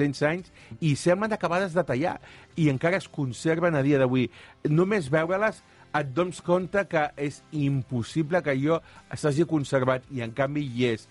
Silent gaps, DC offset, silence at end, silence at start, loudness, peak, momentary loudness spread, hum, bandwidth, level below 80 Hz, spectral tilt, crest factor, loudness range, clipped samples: none; under 0.1%; 0.05 s; 0 s; -26 LUFS; -10 dBFS; 8 LU; none; 11.5 kHz; -58 dBFS; -6.5 dB/octave; 16 dB; 2 LU; under 0.1%